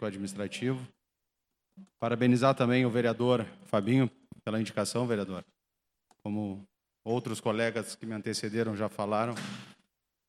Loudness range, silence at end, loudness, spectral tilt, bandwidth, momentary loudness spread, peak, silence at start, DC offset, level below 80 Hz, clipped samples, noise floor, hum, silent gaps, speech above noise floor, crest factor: 7 LU; 0.55 s; -31 LUFS; -6 dB/octave; 13.5 kHz; 13 LU; -10 dBFS; 0 s; under 0.1%; -74 dBFS; under 0.1%; -85 dBFS; none; none; 54 dB; 20 dB